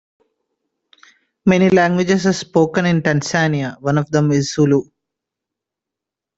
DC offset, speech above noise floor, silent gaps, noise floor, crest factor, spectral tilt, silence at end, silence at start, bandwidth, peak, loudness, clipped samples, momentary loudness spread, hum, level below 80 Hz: under 0.1%; 70 dB; none; -85 dBFS; 18 dB; -6 dB/octave; 1.55 s; 1.45 s; 8 kHz; 0 dBFS; -16 LUFS; under 0.1%; 6 LU; none; -54 dBFS